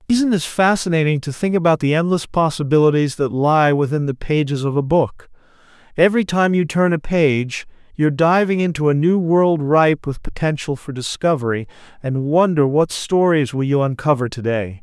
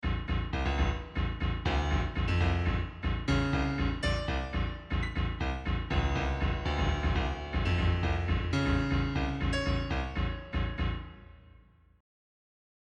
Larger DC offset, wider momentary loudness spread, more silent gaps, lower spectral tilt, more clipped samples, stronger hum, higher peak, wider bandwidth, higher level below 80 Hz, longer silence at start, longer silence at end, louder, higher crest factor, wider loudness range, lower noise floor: neither; about the same, 8 LU vs 6 LU; neither; about the same, -6.5 dB/octave vs -6.5 dB/octave; neither; neither; first, -2 dBFS vs -16 dBFS; first, 12 kHz vs 9.4 kHz; second, -42 dBFS vs -34 dBFS; about the same, 0.1 s vs 0.05 s; second, 0.05 s vs 1.6 s; first, -17 LUFS vs -32 LUFS; about the same, 16 dB vs 14 dB; about the same, 2 LU vs 3 LU; second, -48 dBFS vs -59 dBFS